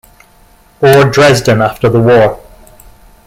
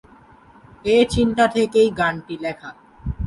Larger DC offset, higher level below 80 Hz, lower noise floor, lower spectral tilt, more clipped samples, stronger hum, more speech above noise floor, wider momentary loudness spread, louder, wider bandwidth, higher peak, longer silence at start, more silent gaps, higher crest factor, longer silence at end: neither; about the same, -38 dBFS vs -38 dBFS; second, -44 dBFS vs -49 dBFS; about the same, -5.5 dB/octave vs -5.5 dB/octave; neither; neither; first, 37 dB vs 30 dB; second, 6 LU vs 17 LU; first, -8 LUFS vs -19 LUFS; first, 16.5 kHz vs 11.5 kHz; first, 0 dBFS vs -4 dBFS; about the same, 0.8 s vs 0.85 s; neither; second, 10 dB vs 16 dB; first, 0.9 s vs 0 s